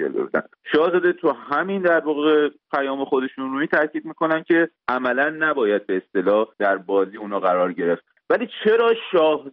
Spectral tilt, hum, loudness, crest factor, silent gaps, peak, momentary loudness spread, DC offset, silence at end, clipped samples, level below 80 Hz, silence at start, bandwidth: -3 dB/octave; none; -21 LUFS; 14 dB; none; -6 dBFS; 6 LU; under 0.1%; 0 s; under 0.1%; -68 dBFS; 0 s; 5.4 kHz